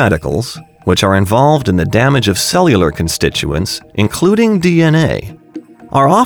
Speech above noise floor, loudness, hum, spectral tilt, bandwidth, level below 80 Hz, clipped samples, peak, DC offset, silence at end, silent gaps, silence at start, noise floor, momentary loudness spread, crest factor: 21 dB; -12 LUFS; none; -5.5 dB/octave; over 20 kHz; -34 dBFS; under 0.1%; 0 dBFS; under 0.1%; 0 s; none; 0 s; -32 dBFS; 11 LU; 12 dB